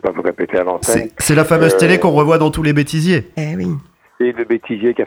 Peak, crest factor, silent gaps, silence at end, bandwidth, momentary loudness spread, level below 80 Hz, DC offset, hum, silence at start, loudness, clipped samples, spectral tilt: 0 dBFS; 14 dB; none; 0 s; over 20 kHz; 10 LU; -42 dBFS; under 0.1%; none; 0.05 s; -15 LUFS; under 0.1%; -5.5 dB/octave